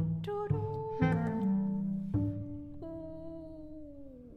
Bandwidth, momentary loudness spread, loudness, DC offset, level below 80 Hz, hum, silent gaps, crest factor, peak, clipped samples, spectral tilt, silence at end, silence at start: 5.8 kHz; 17 LU; -35 LUFS; under 0.1%; -54 dBFS; none; none; 18 dB; -16 dBFS; under 0.1%; -10 dB/octave; 0 s; 0 s